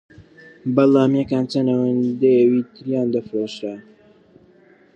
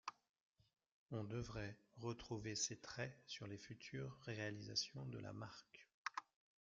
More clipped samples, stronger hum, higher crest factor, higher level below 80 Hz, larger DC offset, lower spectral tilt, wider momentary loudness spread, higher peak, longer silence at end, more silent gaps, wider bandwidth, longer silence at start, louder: neither; neither; second, 18 dB vs 24 dB; first, -62 dBFS vs -72 dBFS; neither; first, -8 dB/octave vs -4 dB/octave; first, 14 LU vs 10 LU; first, -2 dBFS vs -28 dBFS; first, 1.15 s vs 0.4 s; second, none vs 0.29-0.34 s, 0.41-0.53 s, 0.92-1.06 s, 5.94-6.05 s; first, 8.4 kHz vs 7.4 kHz; first, 0.65 s vs 0.05 s; first, -19 LUFS vs -49 LUFS